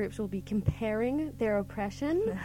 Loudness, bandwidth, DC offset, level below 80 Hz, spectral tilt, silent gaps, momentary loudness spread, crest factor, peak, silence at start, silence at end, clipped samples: -32 LUFS; 16.5 kHz; under 0.1%; -48 dBFS; -7.5 dB/octave; none; 4 LU; 18 dB; -14 dBFS; 0 s; 0 s; under 0.1%